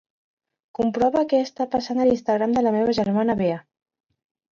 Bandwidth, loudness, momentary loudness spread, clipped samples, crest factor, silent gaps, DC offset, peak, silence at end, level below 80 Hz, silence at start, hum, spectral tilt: 7.4 kHz; -22 LUFS; 6 LU; under 0.1%; 14 dB; none; under 0.1%; -8 dBFS; 0.9 s; -56 dBFS; 0.8 s; none; -7 dB/octave